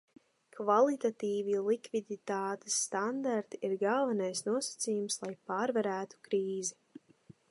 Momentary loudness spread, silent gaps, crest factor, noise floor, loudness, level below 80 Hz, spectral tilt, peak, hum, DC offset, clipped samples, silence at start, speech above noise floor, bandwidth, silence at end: 8 LU; none; 20 dB; -61 dBFS; -33 LUFS; -86 dBFS; -3.5 dB/octave; -14 dBFS; none; under 0.1%; under 0.1%; 0.55 s; 28 dB; 11.5 kHz; 0.8 s